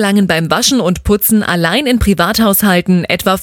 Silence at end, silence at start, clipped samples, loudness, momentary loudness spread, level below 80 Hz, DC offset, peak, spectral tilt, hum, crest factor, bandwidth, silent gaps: 0 s; 0 s; under 0.1%; -11 LUFS; 3 LU; -28 dBFS; under 0.1%; 0 dBFS; -4.5 dB/octave; none; 12 dB; 19.5 kHz; none